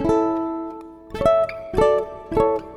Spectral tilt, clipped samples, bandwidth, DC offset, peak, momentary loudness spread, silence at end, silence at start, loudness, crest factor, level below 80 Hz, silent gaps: -7 dB/octave; under 0.1%; 12 kHz; under 0.1%; -4 dBFS; 14 LU; 0 s; 0 s; -21 LUFS; 18 dB; -40 dBFS; none